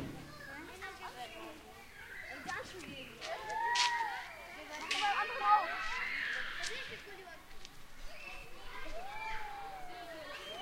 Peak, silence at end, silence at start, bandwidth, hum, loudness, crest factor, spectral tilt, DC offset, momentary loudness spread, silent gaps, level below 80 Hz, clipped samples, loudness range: -16 dBFS; 0 s; 0 s; 16 kHz; none; -38 LUFS; 24 dB; -1.5 dB/octave; under 0.1%; 20 LU; none; -56 dBFS; under 0.1%; 12 LU